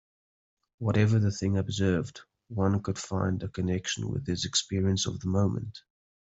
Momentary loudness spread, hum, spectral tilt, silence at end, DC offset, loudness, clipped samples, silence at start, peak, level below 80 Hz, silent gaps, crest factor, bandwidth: 7 LU; none; -5.5 dB/octave; 0.4 s; under 0.1%; -29 LUFS; under 0.1%; 0.8 s; -10 dBFS; -58 dBFS; none; 18 dB; 8.2 kHz